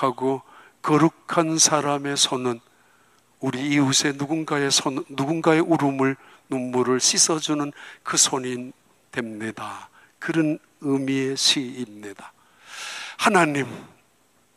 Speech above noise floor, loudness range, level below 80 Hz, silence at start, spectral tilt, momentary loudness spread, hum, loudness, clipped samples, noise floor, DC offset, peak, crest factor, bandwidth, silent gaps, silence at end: 40 dB; 4 LU; -72 dBFS; 0 s; -3 dB/octave; 17 LU; none; -22 LUFS; under 0.1%; -62 dBFS; under 0.1%; -4 dBFS; 20 dB; 15 kHz; none; 0.7 s